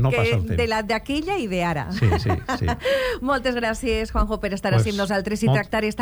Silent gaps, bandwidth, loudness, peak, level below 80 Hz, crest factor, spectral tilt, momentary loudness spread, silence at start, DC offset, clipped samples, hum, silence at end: none; 19.5 kHz; -23 LUFS; -6 dBFS; -34 dBFS; 14 dB; -6 dB/octave; 4 LU; 0 s; under 0.1%; under 0.1%; none; 0 s